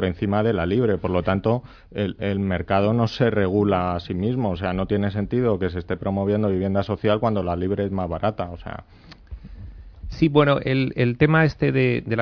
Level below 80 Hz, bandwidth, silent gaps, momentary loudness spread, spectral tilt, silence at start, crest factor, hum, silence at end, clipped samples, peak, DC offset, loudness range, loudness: -42 dBFS; 5.4 kHz; none; 17 LU; -9 dB/octave; 0 s; 18 dB; none; 0 s; under 0.1%; -4 dBFS; under 0.1%; 3 LU; -22 LUFS